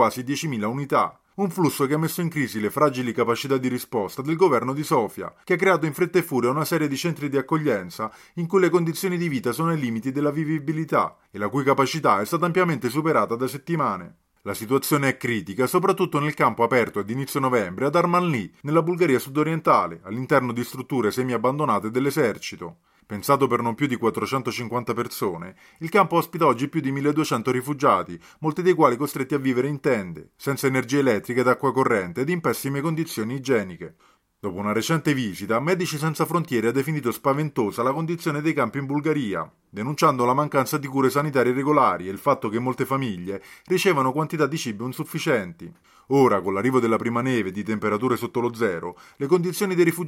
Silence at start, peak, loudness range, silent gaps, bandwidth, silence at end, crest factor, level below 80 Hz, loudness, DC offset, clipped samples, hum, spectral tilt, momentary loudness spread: 0 s; -2 dBFS; 2 LU; none; 16.5 kHz; 0 s; 20 dB; -66 dBFS; -23 LUFS; under 0.1%; under 0.1%; none; -6 dB/octave; 9 LU